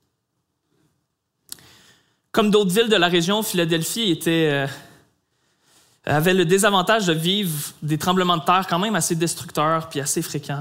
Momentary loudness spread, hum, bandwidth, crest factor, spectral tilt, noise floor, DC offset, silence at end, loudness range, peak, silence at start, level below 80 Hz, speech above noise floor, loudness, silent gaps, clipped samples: 11 LU; none; 16 kHz; 20 dB; -4 dB/octave; -75 dBFS; under 0.1%; 0 s; 3 LU; -2 dBFS; 2.35 s; -60 dBFS; 55 dB; -20 LUFS; none; under 0.1%